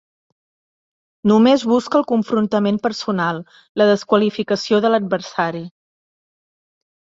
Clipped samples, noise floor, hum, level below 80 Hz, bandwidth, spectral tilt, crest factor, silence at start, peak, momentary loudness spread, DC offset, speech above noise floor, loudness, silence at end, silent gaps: under 0.1%; under -90 dBFS; none; -62 dBFS; 7.8 kHz; -6 dB/octave; 16 dB; 1.25 s; -2 dBFS; 9 LU; under 0.1%; over 73 dB; -17 LUFS; 1.35 s; 3.69-3.75 s